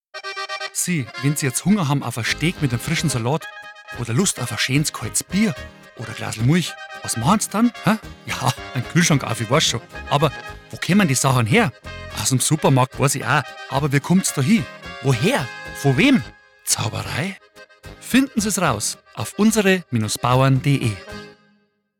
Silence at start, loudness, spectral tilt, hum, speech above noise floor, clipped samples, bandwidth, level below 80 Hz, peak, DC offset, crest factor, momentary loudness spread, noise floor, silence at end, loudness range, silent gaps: 0.15 s; -20 LUFS; -4.5 dB/octave; none; 43 dB; under 0.1%; 19.5 kHz; -48 dBFS; -6 dBFS; under 0.1%; 16 dB; 14 LU; -62 dBFS; 0.7 s; 3 LU; none